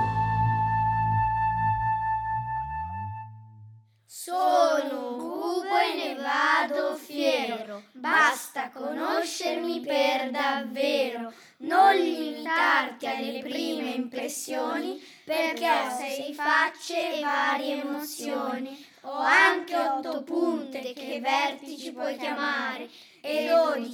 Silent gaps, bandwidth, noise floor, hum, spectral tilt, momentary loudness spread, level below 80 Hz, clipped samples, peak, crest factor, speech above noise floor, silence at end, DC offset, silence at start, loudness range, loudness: none; 19.5 kHz; -52 dBFS; none; -4.5 dB/octave; 14 LU; -54 dBFS; under 0.1%; -8 dBFS; 18 dB; 25 dB; 0 s; under 0.1%; 0 s; 4 LU; -26 LUFS